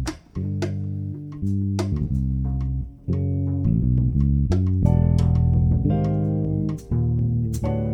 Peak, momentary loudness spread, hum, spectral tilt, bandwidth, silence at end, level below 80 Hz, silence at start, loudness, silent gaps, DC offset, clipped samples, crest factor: -6 dBFS; 9 LU; none; -9 dB/octave; 9.8 kHz; 0 s; -30 dBFS; 0 s; -23 LUFS; none; under 0.1%; under 0.1%; 16 dB